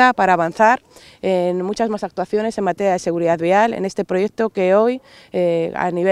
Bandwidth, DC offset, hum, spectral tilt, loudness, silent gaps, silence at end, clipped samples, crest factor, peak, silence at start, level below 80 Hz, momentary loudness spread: 12.5 kHz; under 0.1%; none; -6 dB/octave; -18 LUFS; none; 0 s; under 0.1%; 18 dB; 0 dBFS; 0 s; -58 dBFS; 7 LU